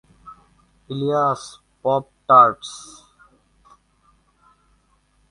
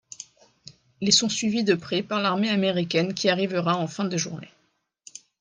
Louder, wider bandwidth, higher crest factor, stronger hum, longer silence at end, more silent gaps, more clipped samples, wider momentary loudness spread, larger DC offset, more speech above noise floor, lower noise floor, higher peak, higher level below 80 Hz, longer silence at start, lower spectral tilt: first, -18 LUFS vs -24 LUFS; first, 11.5 kHz vs 10 kHz; about the same, 22 dB vs 22 dB; neither; first, 2.45 s vs 0.95 s; neither; neither; first, 25 LU vs 22 LU; neither; about the same, 44 dB vs 46 dB; second, -62 dBFS vs -70 dBFS; first, 0 dBFS vs -4 dBFS; first, -62 dBFS vs -68 dBFS; about the same, 0.25 s vs 0.2 s; first, -5.5 dB/octave vs -3.5 dB/octave